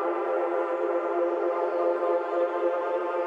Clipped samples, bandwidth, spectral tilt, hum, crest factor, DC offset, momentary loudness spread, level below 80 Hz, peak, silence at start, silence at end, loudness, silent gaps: under 0.1%; 5.6 kHz; -5 dB/octave; none; 12 dB; under 0.1%; 1 LU; under -90 dBFS; -14 dBFS; 0 s; 0 s; -27 LUFS; none